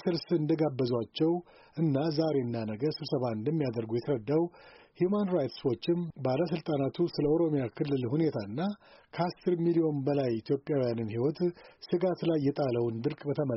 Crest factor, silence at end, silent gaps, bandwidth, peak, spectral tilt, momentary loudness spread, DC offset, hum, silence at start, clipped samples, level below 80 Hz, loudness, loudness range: 14 dB; 0 s; none; 6 kHz; -16 dBFS; -7 dB/octave; 6 LU; under 0.1%; none; 0.05 s; under 0.1%; -66 dBFS; -31 LUFS; 1 LU